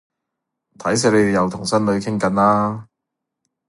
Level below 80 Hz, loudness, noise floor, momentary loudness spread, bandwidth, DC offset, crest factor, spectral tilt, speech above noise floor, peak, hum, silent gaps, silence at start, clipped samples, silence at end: -52 dBFS; -18 LUFS; -81 dBFS; 8 LU; 11.5 kHz; under 0.1%; 18 dB; -5 dB/octave; 63 dB; -2 dBFS; none; none; 0.8 s; under 0.1%; 0.85 s